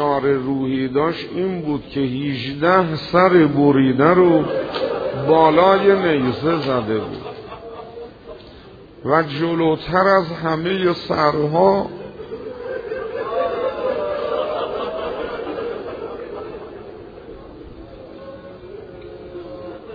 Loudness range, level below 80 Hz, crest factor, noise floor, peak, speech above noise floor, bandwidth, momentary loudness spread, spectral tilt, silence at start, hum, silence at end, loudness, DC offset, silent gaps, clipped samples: 16 LU; -48 dBFS; 18 dB; -41 dBFS; 0 dBFS; 25 dB; 5 kHz; 23 LU; -8.5 dB/octave; 0 s; none; 0 s; -18 LUFS; under 0.1%; none; under 0.1%